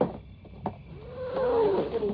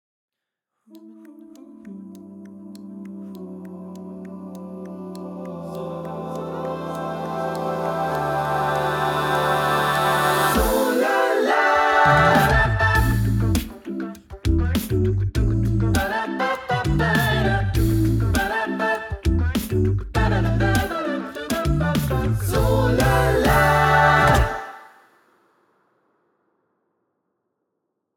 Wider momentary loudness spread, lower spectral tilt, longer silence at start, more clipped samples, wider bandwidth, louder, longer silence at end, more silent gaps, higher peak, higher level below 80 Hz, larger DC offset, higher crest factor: about the same, 20 LU vs 20 LU; about the same, -6.5 dB/octave vs -6 dB/octave; second, 0 s vs 0.95 s; neither; second, 5.2 kHz vs 19.5 kHz; second, -29 LUFS vs -20 LUFS; second, 0 s vs 3.35 s; neither; second, -12 dBFS vs -4 dBFS; second, -50 dBFS vs -32 dBFS; neither; about the same, 18 dB vs 18 dB